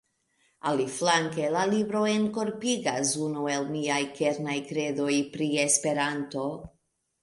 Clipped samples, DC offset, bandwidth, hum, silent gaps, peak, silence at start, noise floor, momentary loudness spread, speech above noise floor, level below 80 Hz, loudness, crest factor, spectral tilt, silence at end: under 0.1%; under 0.1%; 11.5 kHz; none; none; -8 dBFS; 0.65 s; -70 dBFS; 7 LU; 43 dB; -66 dBFS; -27 LUFS; 20 dB; -3.5 dB/octave; 0.55 s